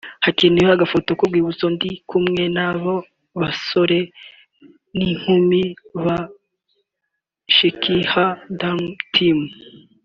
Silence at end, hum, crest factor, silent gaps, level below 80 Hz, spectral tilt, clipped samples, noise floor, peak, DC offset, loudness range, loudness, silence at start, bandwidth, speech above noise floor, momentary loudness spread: 0.35 s; none; 18 dB; none; -52 dBFS; -3.5 dB/octave; under 0.1%; -78 dBFS; -2 dBFS; under 0.1%; 3 LU; -18 LUFS; 0.05 s; 7.2 kHz; 60 dB; 11 LU